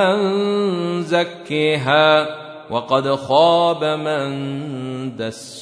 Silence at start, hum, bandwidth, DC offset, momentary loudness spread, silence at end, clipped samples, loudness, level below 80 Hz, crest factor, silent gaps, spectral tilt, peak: 0 s; none; 11 kHz; under 0.1%; 13 LU; 0 s; under 0.1%; -18 LUFS; -66 dBFS; 16 dB; none; -5.5 dB/octave; -2 dBFS